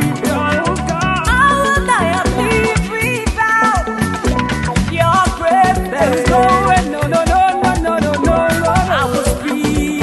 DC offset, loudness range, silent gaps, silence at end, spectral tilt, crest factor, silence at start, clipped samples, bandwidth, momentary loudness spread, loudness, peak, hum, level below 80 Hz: under 0.1%; 2 LU; none; 0 s; -5 dB/octave; 14 dB; 0 s; under 0.1%; 12.5 kHz; 5 LU; -14 LUFS; 0 dBFS; none; -26 dBFS